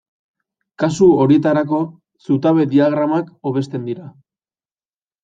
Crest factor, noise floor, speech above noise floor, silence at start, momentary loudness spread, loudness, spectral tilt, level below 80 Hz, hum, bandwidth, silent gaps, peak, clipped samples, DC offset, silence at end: 16 dB; under -90 dBFS; over 74 dB; 0.8 s; 13 LU; -16 LUFS; -7.5 dB/octave; -58 dBFS; none; 7.8 kHz; none; -2 dBFS; under 0.1%; under 0.1%; 1.15 s